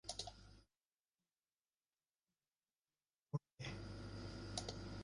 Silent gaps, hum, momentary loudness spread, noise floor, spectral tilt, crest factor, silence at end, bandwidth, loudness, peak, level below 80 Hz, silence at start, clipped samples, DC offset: none; none; 7 LU; under -90 dBFS; -4.5 dB/octave; 28 dB; 0 s; 11 kHz; -50 LUFS; -26 dBFS; -64 dBFS; 0.05 s; under 0.1%; under 0.1%